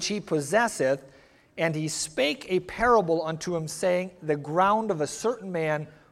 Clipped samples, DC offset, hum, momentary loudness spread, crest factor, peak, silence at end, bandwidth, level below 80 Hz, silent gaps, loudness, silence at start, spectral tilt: under 0.1%; under 0.1%; none; 8 LU; 18 dB; -8 dBFS; 0.2 s; 15.5 kHz; -56 dBFS; none; -26 LUFS; 0 s; -4.5 dB/octave